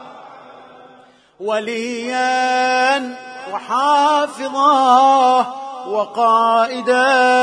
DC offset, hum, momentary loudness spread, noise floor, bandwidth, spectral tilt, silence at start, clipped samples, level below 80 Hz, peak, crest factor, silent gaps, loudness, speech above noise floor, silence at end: under 0.1%; none; 13 LU; -47 dBFS; 10.5 kHz; -2.5 dB/octave; 0 s; under 0.1%; -74 dBFS; -2 dBFS; 16 dB; none; -15 LUFS; 32 dB; 0 s